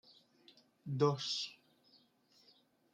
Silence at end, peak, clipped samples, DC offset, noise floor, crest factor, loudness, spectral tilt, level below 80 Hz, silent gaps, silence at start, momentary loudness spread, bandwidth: 1.4 s; -18 dBFS; under 0.1%; under 0.1%; -71 dBFS; 24 dB; -37 LUFS; -5 dB/octave; -84 dBFS; none; 0.85 s; 13 LU; 9.4 kHz